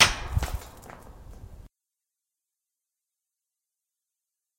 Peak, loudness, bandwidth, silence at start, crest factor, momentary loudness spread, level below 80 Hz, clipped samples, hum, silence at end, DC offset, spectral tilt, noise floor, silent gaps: -2 dBFS; -27 LUFS; 16.5 kHz; 0 s; 30 dB; 21 LU; -42 dBFS; under 0.1%; none; 2.9 s; under 0.1%; -1.5 dB/octave; -87 dBFS; none